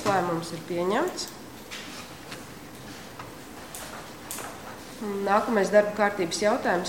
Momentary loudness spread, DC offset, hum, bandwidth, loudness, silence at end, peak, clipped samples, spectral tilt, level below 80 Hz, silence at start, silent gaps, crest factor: 19 LU; 0.2%; none; 17 kHz; -27 LUFS; 0 s; -6 dBFS; under 0.1%; -4 dB/octave; -60 dBFS; 0 s; none; 22 dB